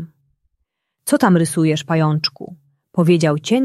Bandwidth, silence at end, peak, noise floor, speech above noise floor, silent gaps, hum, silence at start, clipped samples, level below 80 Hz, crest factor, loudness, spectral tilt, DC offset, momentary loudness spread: 13.5 kHz; 0 s; -2 dBFS; -73 dBFS; 58 dB; none; none; 0 s; under 0.1%; -60 dBFS; 16 dB; -17 LUFS; -6 dB/octave; under 0.1%; 18 LU